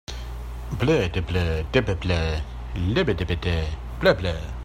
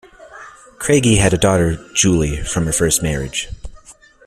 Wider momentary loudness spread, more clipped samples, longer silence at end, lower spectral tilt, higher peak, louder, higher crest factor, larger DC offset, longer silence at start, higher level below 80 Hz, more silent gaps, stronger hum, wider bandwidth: about the same, 12 LU vs 12 LU; neither; second, 0 s vs 0.35 s; first, -6.5 dB/octave vs -4 dB/octave; about the same, -4 dBFS vs -2 dBFS; second, -24 LUFS vs -16 LUFS; about the same, 20 dB vs 16 dB; neither; about the same, 0.1 s vs 0.2 s; about the same, -34 dBFS vs -32 dBFS; neither; neither; second, 14 kHz vs 15.5 kHz